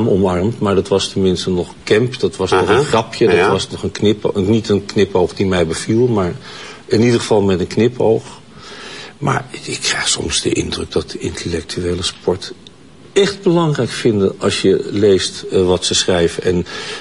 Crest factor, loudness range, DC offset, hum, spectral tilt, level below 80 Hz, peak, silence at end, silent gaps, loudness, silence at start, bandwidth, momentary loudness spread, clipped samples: 14 dB; 4 LU; 0.4%; none; -5 dB/octave; -42 dBFS; -2 dBFS; 0 s; none; -16 LUFS; 0 s; 11.5 kHz; 9 LU; under 0.1%